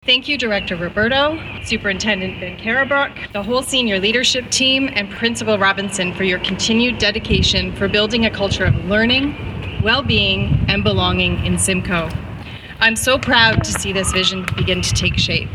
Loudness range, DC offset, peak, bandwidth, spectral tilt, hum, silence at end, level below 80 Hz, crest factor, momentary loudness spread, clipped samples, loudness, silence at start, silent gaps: 2 LU; under 0.1%; 0 dBFS; 15.5 kHz; -3.5 dB/octave; none; 0 s; -32 dBFS; 18 dB; 7 LU; under 0.1%; -16 LUFS; 0.05 s; none